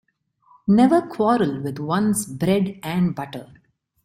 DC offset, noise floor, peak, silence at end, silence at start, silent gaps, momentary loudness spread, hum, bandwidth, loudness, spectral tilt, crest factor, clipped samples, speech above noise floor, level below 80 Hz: under 0.1%; -60 dBFS; -6 dBFS; 0.6 s; 0.65 s; none; 14 LU; none; 14.5 kHz; -21 LUFS; -6 dB/octave; 16 dB; under 0.1%; 40 dB; -58 dBFS